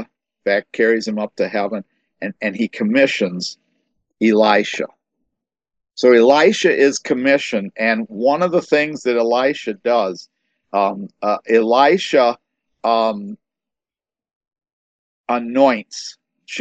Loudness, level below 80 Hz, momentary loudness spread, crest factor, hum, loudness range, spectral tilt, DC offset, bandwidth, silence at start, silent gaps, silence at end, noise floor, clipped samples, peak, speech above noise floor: -17 LUFS; -70 dBFS; 16 LU; 18 dB; none; 6 LU; -4.5 dB/octave; under 0.1%; 8.8 kHz; 0 s; 14.35-14.41 s, 14.73-15.24 s; 0 s; under -90 dBFS; under 0.1%; 0 dBFS; over 74 dB